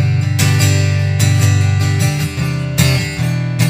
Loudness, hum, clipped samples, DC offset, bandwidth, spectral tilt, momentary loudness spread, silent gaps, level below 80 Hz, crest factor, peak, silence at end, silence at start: -14 LUFS; none; under 0.1%; under 0.1%; 16 kHz; -5 dB/octave; 5 LU; none; -40 dBFS; 14 dB; 0 dBFS; 0 s; 0 s